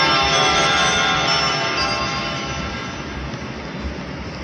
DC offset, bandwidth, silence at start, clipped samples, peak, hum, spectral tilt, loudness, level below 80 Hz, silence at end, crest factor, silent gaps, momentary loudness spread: under 0.1%; 11.5 kHz; 0 s; under 0.1%; -6 dBFS; none; -2.5 dB/octave; -18 LUFS; -38 dBFS; 0 s; 16 dB; none; 14 LU